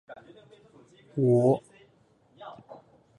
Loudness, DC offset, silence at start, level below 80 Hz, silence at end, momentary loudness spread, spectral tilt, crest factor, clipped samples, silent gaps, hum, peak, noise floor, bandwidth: -25 LUFS; under 0.1%; 0.1 s; -72 dBFS; 0.45 s; 27 LU; -9.5 dB/octave; 20 dB; under 0.1%; none; none; -10 dBFS; -63 dBFS; 10.5 kHz